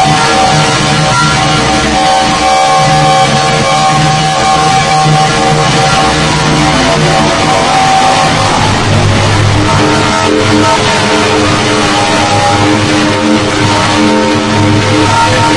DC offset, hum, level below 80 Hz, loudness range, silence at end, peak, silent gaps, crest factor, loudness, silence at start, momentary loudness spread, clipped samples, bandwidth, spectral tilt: under 0.1%; none; -28 dBFS; 1 LU; 0 s; 0 dBFS; none; 8 dB; -7 LUFS; 0 s; 2 LU; 0.7%; 12 kHz; -4 dB/octave